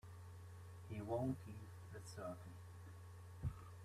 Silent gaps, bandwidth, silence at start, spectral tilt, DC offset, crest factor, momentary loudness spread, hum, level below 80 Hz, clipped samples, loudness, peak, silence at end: none; 14 kHz; 0.05 s; -7.5 dB/octave; under 0.1%; 20 dB; 14 LU; none; -64 dBFS; under 0.1%; -51 LUFS; -30 dBFS; 0 s